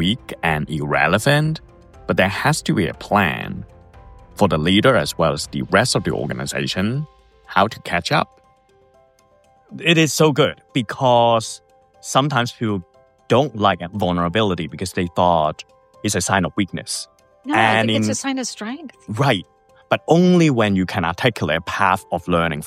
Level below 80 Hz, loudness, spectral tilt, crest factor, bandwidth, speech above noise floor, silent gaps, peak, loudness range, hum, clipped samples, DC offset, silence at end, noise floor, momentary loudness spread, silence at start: -48 dBFS; -19 LUFS; -5 dB/octave; 20 dB; 15.5 kHz; 37 dB; none; 0 dBFS; 3 LU; none; under 0.1%; under 0.1%; 0 s; -55 dBFS; 12 LU; 0 s